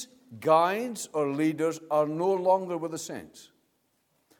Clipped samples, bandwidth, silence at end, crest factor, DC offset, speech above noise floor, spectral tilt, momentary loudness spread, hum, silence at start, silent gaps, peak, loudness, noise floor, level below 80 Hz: under 0.1%; 18 kHz; 0.95 s; 20 dB; under 0.1%; 45 dB; -5 dB/octave; 14 LU; none; 0 s; none; -8 dBFS; -27 LUFS; -73 dBFS; -78 dBFS